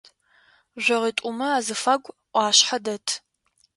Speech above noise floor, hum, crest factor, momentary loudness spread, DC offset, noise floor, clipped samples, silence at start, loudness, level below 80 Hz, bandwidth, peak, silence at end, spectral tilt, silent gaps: 37 dB; none; 22 dB; 11 LU; under 0.1%; -60 dBFS; under 0.1%; 0.75 s; -22 LUFS; -74 dBFS; 11.5 kHz; -4 dBFS; 0.6 s; -0.5 dB/octave; none